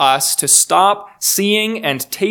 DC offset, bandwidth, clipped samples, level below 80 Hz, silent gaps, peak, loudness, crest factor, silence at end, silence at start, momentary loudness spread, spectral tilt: under 0.1%; over 20 kHz; under 0.1%; -66 dBFS; none; 0 dBFS; -13 LUFS; 14 dB; 0 s; 0 s; 9 LU; -1.5 dB/octave